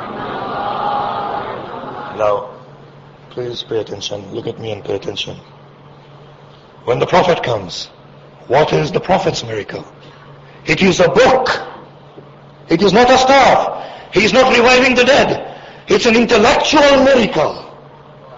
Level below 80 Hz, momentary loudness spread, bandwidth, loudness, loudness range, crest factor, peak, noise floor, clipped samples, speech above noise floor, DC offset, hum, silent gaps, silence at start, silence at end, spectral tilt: -42 dBFS; 18 LU; 7.8 kHz; -13 LUFS; 14 LU; 16 dB; 0 dBFS; -41 dBFS; under 0.1%; 28 dB; under 0.1%; none; none; 0 s; 0 s; -4.5 dB/octave